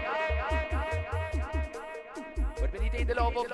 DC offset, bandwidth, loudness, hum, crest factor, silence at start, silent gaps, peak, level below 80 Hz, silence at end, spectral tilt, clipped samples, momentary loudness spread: under 0.1%; 11 kHz; -33 LUFS; none; 16 dB; 0 s; none; -16 dBFS; -34 dBFS; 0 s; -6.5 dB/octave; under 0.1%; 11 LU